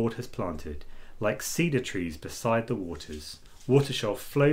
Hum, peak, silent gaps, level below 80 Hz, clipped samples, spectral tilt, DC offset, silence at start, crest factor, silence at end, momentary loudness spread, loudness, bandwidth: none; -8 dBFS; none; -48 dBFS; under 0.1%; -5.5 dB/octave; under 0.1%; 0 s; 20 dB; 0 s; 15 LU; -29 LUFS; 16 kHz